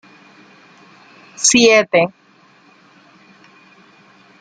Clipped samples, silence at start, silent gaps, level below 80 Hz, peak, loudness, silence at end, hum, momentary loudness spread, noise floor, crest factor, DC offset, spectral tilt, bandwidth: under 0.1%; 1.4 s; none; -60 dBFS; 0 dBFS; -12 LUFS; 2.3 s; none; 7 LU; -50 dBFS; 20 dB; under 0.1%; -2 dB/octave; 10 kHz